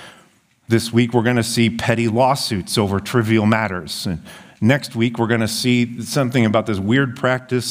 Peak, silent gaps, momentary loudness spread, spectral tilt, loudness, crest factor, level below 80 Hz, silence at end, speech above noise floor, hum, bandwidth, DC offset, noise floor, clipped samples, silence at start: 0 dBFS; none; 5 LU; -5.5 dB/octave; -18 LUFS; 18 dB; -52 dBFS; 0 s; 36 dB; none; 16 kHz; under 0.1%; -54 dBFS; under 0.1%; 0 s